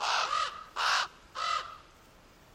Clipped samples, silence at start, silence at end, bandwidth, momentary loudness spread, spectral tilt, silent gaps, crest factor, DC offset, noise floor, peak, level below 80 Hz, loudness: under 0.1%; 0 s; 0.7 s; 16 kHz; 12 LU; 1 dB/octave; none; 18 dB; under 0.1%; -58 dBFS; -16 dBFS; -64 dBFS; -31 LUFS